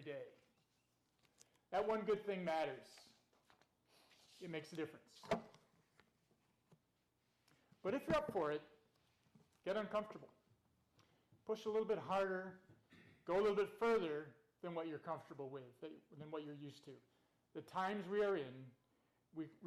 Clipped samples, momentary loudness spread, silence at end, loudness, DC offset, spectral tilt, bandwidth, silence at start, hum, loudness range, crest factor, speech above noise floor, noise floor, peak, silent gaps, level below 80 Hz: under 0.1%; 18 LU; 0 s; -43 LUFS; under 0.1%; -6 dB/octave; 14 kHz; 0 s; none; 10 LU; 16 dB; 40 dB; -83 dBFS; -30 dBFS; none; -78 dBFS